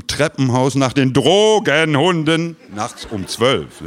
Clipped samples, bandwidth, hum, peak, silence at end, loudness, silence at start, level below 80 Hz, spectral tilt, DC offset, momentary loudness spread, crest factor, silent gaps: under 0.1%; 15.5 kHz; none; 0 dBFS; 0 s; -15 LUFS; 0.1 s; -48 dBFS; -5 dB/octave; under 0.1%; 13 LU; 16 dB; none